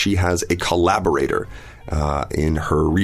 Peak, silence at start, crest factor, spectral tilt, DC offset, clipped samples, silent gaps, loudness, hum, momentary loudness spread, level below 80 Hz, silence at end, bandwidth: -4 dBFS; 0 s; 16 dB; -5.5 dB/octave; under 0.1%; under 0.1%; none; -20 LUFS; none; 9 LU; -30 dBFS; 0 s; 15 kHz